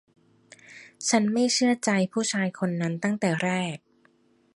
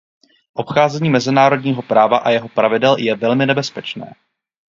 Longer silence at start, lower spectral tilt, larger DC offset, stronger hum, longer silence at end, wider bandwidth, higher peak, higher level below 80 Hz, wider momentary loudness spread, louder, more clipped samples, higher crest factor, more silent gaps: first, 0.7 s vs 0.55 s; second, -4 dB/octave vs -6 dB/octave; neither; neither; first, 0.8 s vs 0.6 s; first, 11.5 kHz vs 7.6 kHz; second, -8 dBFS vs 0 dBFS; second, -72 dBFS vs -62 dBFS; second, 8 LU vs 14 LU; second, -25 LUFS vs -15 LUFS; neither; about the same, 18 dB vs 16 dB; neither